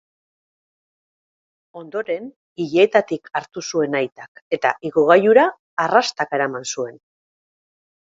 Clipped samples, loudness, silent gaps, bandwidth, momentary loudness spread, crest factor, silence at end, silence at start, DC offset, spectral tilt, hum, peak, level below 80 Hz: under 0.1%; -19 LUFS; 2.36-2.56 s, 4.12-4.16 s, 4.28-4.35 s, 4.42-4.51 s, 5.59-5.77 s; 8 kHz; 14 LU; 20 dB; 1.1 s; 1.75 s; under 0.1%; -4 dB/octave; none; 0 dBFS; -70 dBFS